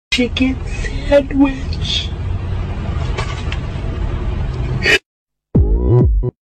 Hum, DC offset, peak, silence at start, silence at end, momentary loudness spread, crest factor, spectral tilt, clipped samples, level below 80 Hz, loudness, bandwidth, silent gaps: none; under 0.1%; -2 dBFS; 0.1 s; 0.15 s; 10 LU; 14 dB; -6 dB/octave; under 0.1%; -22 dBFS; -17 LUFS; 11 kHz; 5.06-5.26 s